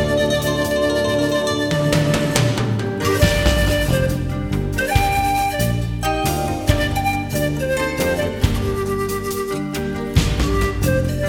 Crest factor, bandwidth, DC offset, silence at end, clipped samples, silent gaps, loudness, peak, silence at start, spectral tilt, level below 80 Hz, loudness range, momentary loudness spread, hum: 18 dB; 19 kHz; under 0.1%; 0 s; under 0.1%; none; -19 LUFS; 0 dBFS; 0 s; -5 dB/octave; -28 dBFS; 3 LU; 5 LU; none